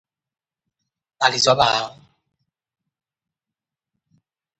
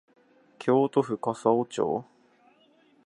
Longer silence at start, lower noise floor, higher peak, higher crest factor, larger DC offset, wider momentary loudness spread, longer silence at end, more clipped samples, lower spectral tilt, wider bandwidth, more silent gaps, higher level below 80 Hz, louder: first, 1.2 s vs 0.6 s; first, -88 dBFS vs -62 dBFS; first, 0 dBFS vs -8 dBFS; about the same, 24 dB vs 20 dB; neither; about the same, 9 LU vs 8 LU; first, 2.7 s vs 1.05 s; neither; second, -2 dB/octave vs -7 dB/octave; second, 8.8 kHz vs 11 kHz; neither; first, -60 dBFS vs -72 dBFS; first, -18 LUFS vs -27 LUFS